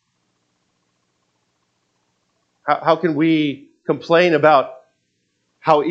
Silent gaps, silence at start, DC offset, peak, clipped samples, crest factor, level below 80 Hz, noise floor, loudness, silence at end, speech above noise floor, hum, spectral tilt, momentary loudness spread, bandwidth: none; 2.65 s; under 0.1%; 0 dBFS; under 0.1%; 20 dB; -74 dBFS; -69 dBFS; -17 LUFS; 0 s; 53 dB; none; -7 dB/octave; 13 LU; 7.6 kHz